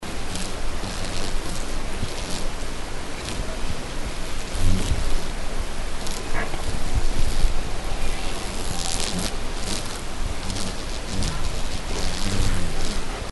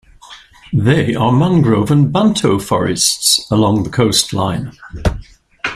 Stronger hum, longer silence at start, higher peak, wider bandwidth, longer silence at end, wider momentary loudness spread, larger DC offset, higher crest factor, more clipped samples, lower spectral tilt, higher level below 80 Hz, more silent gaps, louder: neither; second, 0 s vs 0.3 s; second, -4 dBFS vs 0 dBFS; second, 12 kHz vs 16 kHz; about the same, 0 s vs 0 s; second, 6 LU vs 9 LU; first, 0.2% vs under 0.1%; about the same, 18 dB vs 14 dB; neither; about the same, -3.5 dB/octave vs -4.5 dB/octave; first, -24 dBFS vs -34 dBFS; neither; second, -29 LUFS vs -14 LUFS